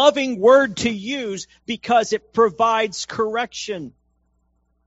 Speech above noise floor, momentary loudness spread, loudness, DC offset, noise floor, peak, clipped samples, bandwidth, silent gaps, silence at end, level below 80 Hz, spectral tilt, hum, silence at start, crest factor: 46 dB; 15 LU; -20 LUFS; under 0.1%; -66 dBFS; 0 dBFS; under 0.1%; 8 kHz; none; 1 s; -58 dBFS; -2 dB/octave; none; 0 s; 20 dB